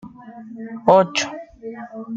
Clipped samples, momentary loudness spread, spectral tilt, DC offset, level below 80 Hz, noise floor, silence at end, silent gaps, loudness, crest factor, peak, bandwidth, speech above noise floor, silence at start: under 0.1%; 23 LU; -4 dB/octave; under 0.1%; -58 dBFS; -38 dBFS; 0 s; none; -18 LUFS; 20 dB; -2 dBFS; 8 kHz; 19 dB; 0.05 s